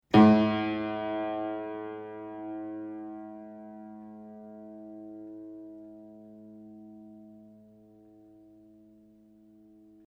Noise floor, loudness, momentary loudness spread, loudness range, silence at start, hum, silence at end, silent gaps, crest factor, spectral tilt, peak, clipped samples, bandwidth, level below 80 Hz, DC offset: -58 dBFS; -29 LUFS; 23 LU; 20 LU; 0.1 s; none; 2.7 s; none; 26 dB; -8.5 dB/octave; -6 dBFS; under 0.1%; 6 kHz; -66 dBFS; under 0.1%